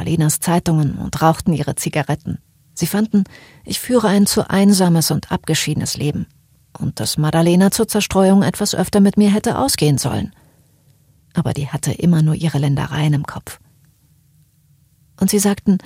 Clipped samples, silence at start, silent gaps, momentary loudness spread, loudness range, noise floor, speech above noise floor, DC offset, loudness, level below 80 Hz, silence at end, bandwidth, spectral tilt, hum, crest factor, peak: under 0.1%; 0 s; none; 12 LU; 5 LU; -55 dBFS; 39 dB; under 0.1%; -17 LUFS; -44 dBFS; 0.05 s; 16.5 kHz; -5.5 dB/octave; none; 16 dB; 0 dBFS